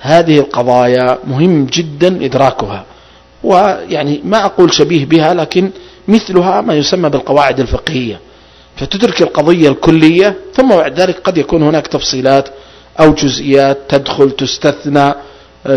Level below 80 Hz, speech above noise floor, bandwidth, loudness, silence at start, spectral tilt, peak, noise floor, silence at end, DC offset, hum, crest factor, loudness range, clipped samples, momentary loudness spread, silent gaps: -36 dBFS; 30 dB; 11 kHz; -10 LUFS; 0 s; -5.5 dB/octave; 0 dBFS; -40 dBFS; 0 s; under 0.1%; none; 10 dB; 3 LU; 2%; 9 LU; none